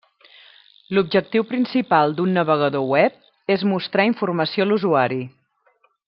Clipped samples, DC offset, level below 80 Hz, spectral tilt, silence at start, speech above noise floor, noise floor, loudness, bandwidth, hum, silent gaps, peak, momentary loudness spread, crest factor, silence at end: under 0.1%; under 0.1%; -68 dBFS; -9.5 dB/octave; 0.9 s; 43 dB; -62 dBFS; -20 LUFS; 5.8 kHz; none; none; -2 dBFS; 5 LU; 18 dB; 0.8 s